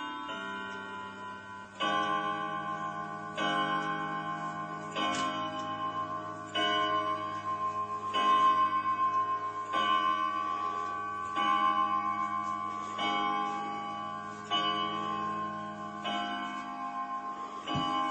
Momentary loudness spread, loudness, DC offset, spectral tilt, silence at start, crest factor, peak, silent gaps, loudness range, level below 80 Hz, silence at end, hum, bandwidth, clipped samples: 11 LU; -32 LUFS; under 0.1%; -3.5 dB/octave; 0 s; 16 dB; -18 dBFS; none; 5 LU; -74 dBFS; 0 s; none; 8.8 kHz; under 0.1%